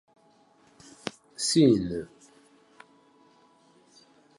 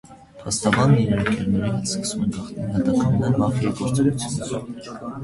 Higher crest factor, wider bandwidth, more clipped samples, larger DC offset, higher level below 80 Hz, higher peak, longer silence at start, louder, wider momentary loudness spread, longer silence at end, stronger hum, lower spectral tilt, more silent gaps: about the same, 22 dB vs 18 dB; about the same, 11.5 kHz vs 11.5 kHz; neither; neither; second, -60 dBFS vs -44 dBFS; second, -10 dBFS vs -4 dBFS; first, 1.05 s vs 0.1 s; second, -26 LUFS vs -22 LUFS; first, 19 LU vs 12 LU; first, 2.35 s vs 0 s; neither; about the same, -5 dB/octave vs -5.5 dB/octave; neither